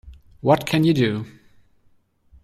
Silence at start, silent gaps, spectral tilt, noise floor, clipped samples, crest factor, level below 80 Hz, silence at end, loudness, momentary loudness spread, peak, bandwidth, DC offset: 0.05 s; none; -6.5 dB/octave; -59 dBFS; under 0.1%; 20 dB; -52 dBFS; 1.15 s; -20 LUFS; 13 LU; -4 dBFS; 15 kHz; under 0.1%